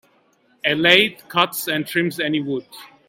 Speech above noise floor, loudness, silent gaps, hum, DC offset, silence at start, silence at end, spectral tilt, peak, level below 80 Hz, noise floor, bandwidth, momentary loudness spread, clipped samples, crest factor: 40 dB; -19 LUFS; none; none; under 0.1%; 0.65 s; 0.25 s; -3.5 dB/octave; 0 dBFS; -62 dBFS; -60 dBFS; 17 kHz; 11 LU; under 0.1%; 22 dB